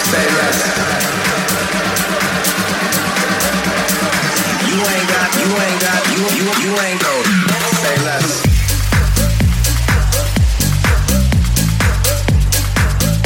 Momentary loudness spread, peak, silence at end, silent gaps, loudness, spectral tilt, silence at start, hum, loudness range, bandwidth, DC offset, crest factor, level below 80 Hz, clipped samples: 2 LU; -2 dBFS; 0 s; none; -14 LUFS; -4 dB/octave; 0 s; none; 1 LU; 17 kHz; under 0.1%; 12 dB; -20 dBFS; under 0.1%